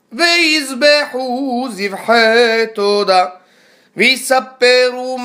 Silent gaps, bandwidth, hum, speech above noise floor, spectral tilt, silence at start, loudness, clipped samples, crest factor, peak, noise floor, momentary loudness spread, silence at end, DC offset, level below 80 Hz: none; 16 kHz; none; 37 dB; -2 dB/octave; 0.1 s; -13 LUFS; under 0.1%; 14 dB; 0 dBFS; -50 dBFS; 9 LU; 0 s; under 0.1%; -70 dBFS